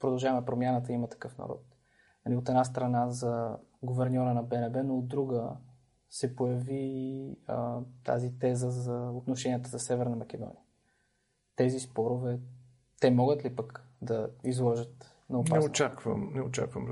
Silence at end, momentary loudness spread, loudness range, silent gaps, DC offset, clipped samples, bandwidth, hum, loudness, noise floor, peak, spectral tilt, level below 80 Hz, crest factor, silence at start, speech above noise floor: 0 s; 13 LU; 4 LU; none; under 0.1%; under 0.1%; 11.5 kHz; none; -32 LUFS; -76 dBFS; -10 dBFS; -6.5 dB/octave; -68 dBFS; 22 dB; 0 s; 45 dB